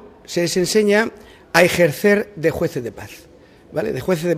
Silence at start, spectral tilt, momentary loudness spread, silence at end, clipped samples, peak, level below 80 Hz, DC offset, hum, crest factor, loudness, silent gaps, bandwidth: 0.05 s; -4.5 dB/octave; 14 LU; 0 s; under 0.1%; 0 dBFS; -50 dBFS; under 0.1%; none; 18 dB; -18 LUFS; none; 16 kHz